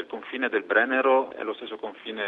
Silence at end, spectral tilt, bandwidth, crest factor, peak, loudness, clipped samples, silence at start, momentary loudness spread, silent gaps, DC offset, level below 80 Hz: 0 s; -5.5 dB/octave; 4.2 kHz; 18 dB; -8 dBFS; -25 LUFS; under 0.1%; 0 s; 14 LU; none; under 0.1%; -76 dBFS